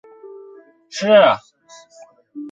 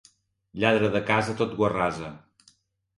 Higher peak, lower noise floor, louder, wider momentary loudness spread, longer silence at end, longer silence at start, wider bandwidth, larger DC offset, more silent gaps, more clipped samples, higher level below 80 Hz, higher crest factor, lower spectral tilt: first, -2 dBFS vs -6 dBFS; second, -47 dBFS vs -63 dBFS; first, -15 LUFS vs -25 LUFS; first, 24 LU vs 15 LU; second, 0 s vs 0.8 s; second, 0.25 s vs 0.55 s; second, 7.8 kHz vs 11.5 kHz; neither; neither; neither; second, -66 dBFS vs -56 dBFS; about the same, 18 dB vs 20 dB; second, -4 dB/octave vs -6 dB/octave